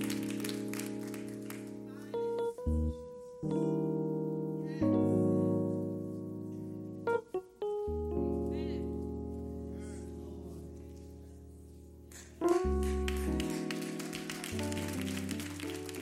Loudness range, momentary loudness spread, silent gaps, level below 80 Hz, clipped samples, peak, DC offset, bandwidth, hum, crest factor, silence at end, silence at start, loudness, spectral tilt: 7 LU; 16 LU; none; -46 dBFS; under 0.1%; -18 dBFS; under 0.1%; 16 kHz; none; 18 dB; 0 s; 0 s; -36 LUFS; -6 dB/octave